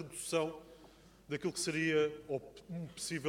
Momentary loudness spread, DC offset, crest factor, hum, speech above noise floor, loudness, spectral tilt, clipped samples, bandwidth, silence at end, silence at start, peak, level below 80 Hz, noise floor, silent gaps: 14 LU; under 0.1%; 18 dB; none; 23 dB; -37 LUFS; -4 dB/octave; under 0.1%; 16.5 kHz; 0 s; 0 s; -20 dBFS; -68 dBFS; -60 dBFS; none